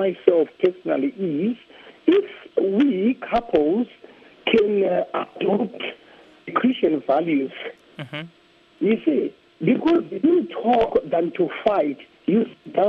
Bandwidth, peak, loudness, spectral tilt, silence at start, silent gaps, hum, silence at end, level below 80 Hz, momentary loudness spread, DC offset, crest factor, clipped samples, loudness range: 6 kHz; 0 dBFS; -22 LUFS; -8.5 dB/octave; 0 s; none; none; 0 s; -56 dBFS; 12 LU; under 0.1%; 22 dB; under 0.1%; 3 LU